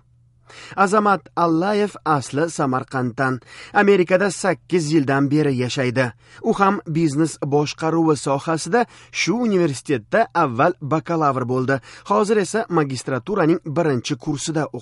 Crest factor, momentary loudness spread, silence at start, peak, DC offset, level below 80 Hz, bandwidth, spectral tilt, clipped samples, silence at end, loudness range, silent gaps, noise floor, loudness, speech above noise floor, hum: 16 dB; 6 LU; 0.55 s; -2 dBFS; under 0.1%; -58 dBFS; 11.5 kHz; -5.5 dB/octave; under 0.1%; 0 s; 1 LU; none; -54 dBFS; -20 LUFS; 35 dB; none